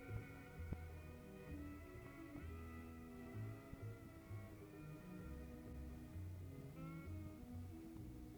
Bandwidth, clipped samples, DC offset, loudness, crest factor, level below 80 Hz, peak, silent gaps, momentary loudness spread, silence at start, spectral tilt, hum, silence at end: over 20 kHz; under 0.1%; under 0.1%; -55 LUFS; 18 dB; -60 dBFS; -34 dBFS; none; 4 LU; 0 s; -7.5 dB/octave; none; 0 s